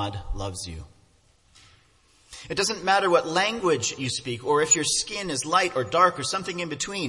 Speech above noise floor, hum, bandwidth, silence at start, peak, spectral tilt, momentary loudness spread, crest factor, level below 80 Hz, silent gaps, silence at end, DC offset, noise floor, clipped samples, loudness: 36 dB; none; 11.5 kHz; 0 s; -4 dBFS; -2.5 dB/octave; 13 LU; 22 dB; -46 dBFS; none; 0 s; under 0.1%; -61 dBFS; under 0.1%; -24 LUFS